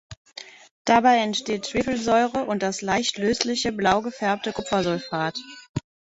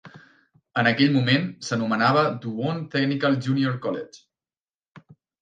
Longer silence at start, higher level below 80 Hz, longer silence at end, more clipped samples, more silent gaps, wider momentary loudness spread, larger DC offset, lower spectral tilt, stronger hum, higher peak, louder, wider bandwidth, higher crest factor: about the same, 0.1 s vs 0.05 s; first, -54 dBFS vs -68 dBFS; about the same, 0.3 s vs 0.4 s; neither; first, 0.17-0.25 s, 0.71-0.85 s, 5.69-5.75 s vs 4.60-4.64 s, 4.74-4.81 s, 4.88-4.95 s; first, 16 LU vs 10 LU; neither; second, -4 dB/octave vs -6 dB/octave; neither; about the same, -4 dBFS vs -4 dBFS; about the same, -23 LUFS vs -23 LUFS; second, 8 kHz vs 9.2 kHz; about the same, 20 dB vs 20 dB